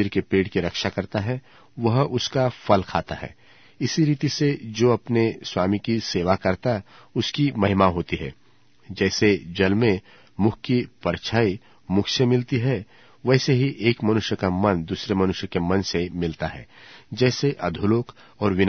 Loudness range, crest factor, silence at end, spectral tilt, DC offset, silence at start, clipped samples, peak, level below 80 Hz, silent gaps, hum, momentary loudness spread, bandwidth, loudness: 2 LU; 20 dB; 0 s; -6 dB/octave; 0.2%; 0 s; under 0.1%; -2 dBFS; -50 dBFS; none; none; 9 LU; 6.6 kHz; -23 LUFS